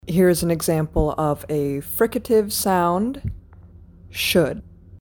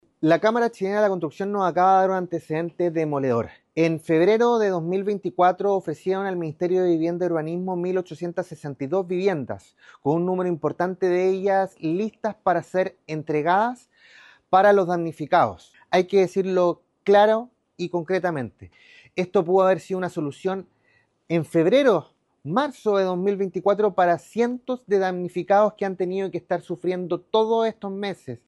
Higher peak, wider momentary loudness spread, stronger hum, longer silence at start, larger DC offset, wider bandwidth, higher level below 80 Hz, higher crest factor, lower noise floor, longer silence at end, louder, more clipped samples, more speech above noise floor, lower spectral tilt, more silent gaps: about the same, -6 dBFS vs -6 dBFS; first, 14 LU vs 11 LU; neither; second, 0.05 s vs 0.2 s; neither; first, 17.5 kHz vs 12 kHz; first, -38 dBFS vs -68 dBFS; about the same, 16 dB vs 16 dB; second, -45 dBFS vs -64 dBFS; about the same, 0.05 s vs 0.1 s; about the same, -21 LUFS vs -23 LUFS; neither; second, 25 dB vs 42 dB; second, -5 dB/octave vs -7 dB/octave; neither